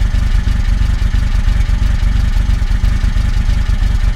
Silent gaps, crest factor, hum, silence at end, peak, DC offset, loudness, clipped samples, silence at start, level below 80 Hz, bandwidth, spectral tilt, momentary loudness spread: none; 10 dB; none; 0 s; -2 dBFS; under 0.1%; -16 LUFS; under 0.1%; 0 s; -12 dBFS; 9.4 kHz; -6 dB/octave; 1 LU